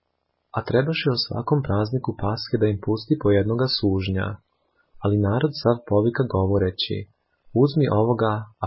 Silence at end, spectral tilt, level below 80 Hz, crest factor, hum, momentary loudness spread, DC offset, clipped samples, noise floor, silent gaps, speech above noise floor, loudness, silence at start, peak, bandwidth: 0 s; -11 dB/octave; -42 dBFS; 16 dB; none; 7 LU; under 0.1%; under 0.1%; -74 dBFS; none; 52 dB; -23 LUFS; 0.55 s; -6 dBFS; 5.8 kHz